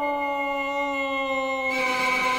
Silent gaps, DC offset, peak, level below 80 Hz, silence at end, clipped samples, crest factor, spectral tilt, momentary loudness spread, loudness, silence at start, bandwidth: none; under 0.1%; -12 dBFS; -56 dBFS; 0 s; under 0.1%; 12 dB; -2.5 dB/octave; 4 LU; -25 LUFS; 0 s; 19.5 kHz